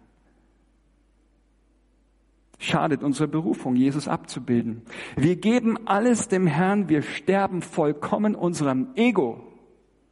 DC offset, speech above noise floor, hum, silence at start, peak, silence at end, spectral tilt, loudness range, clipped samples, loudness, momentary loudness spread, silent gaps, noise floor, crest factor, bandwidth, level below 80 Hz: under 0.1%; 39 dB; none; 2.6 s; -8 dBFS; 0.6 s; -6 dB/octave; 6 LU; under 0.1%; -24 LUFS; 8 LU; none; -62 dBFS; 18 dB; 11.5 kHz; -60 dBFS